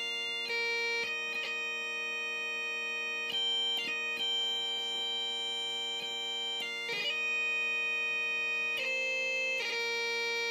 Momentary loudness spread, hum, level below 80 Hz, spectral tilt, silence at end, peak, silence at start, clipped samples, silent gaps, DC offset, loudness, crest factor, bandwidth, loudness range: 4 LU; none; under -90 dBFS; 0.5 dB/octave; 0 s; -24 dBFS; 0 s; under 0.1%; none; under 0.1%; -31 LUFS; 12 dB; 15.5 kHz; 2 LU